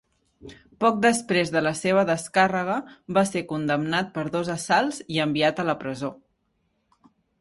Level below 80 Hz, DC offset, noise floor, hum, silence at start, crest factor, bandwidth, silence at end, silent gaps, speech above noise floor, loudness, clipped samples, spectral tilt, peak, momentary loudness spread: -62 dBFS; under 0.1%; -72 dBFS; none; 0.45 s; 20 dB; 11.5 kHz; 1.25 s; none; 48 dB; -24 LUFS; under 0.1%; -4.5 dB/octave; -6 dBFS; 7 LU